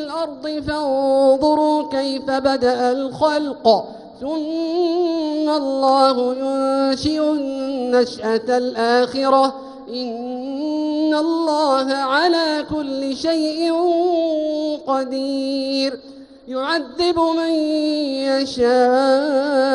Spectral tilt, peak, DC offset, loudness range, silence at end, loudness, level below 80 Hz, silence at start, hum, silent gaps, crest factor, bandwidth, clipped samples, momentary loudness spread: -4.5 dB/octave; 0 dBFS; under 0.1%; 3 LU; 0 s; -19 LUFS; -52 dBFS; 0 s; none; none; 18 dB; 11 kHz; under 0.1%; 9 LU